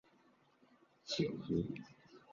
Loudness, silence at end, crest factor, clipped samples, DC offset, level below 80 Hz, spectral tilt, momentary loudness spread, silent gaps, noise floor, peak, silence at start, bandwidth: -40 LUFS; 0 s; 20 dB; under 0.1%; under 0.1%; -66 dBFS; -5.5 dB/octave; 18 LU; none; -71 dBFS; -24 dBFS; 1.05 s; 7.2 kHz